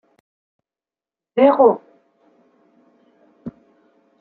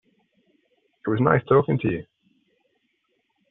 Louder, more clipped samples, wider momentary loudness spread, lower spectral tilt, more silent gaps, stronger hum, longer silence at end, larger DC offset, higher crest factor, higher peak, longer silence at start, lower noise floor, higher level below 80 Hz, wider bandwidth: first, -16 LUFS vs -22 LUFS; neither; first, 25 LU vs 13 LU; first, -9 dB/octave vs -7.5 dB/octave; neither; neither; second, 0.7 s vs 1.45 s; neither; about the same, 22 dB vs 22 dB; about the same, -2 dBFS vs -4 dBFS; first, 1.35 s vs 1.05 s; first, under -90 dBFS vs -72 dBFS; second, -68 dBFS vs -58 dBFS; first, 4.4 kHz vs 3.9 kHz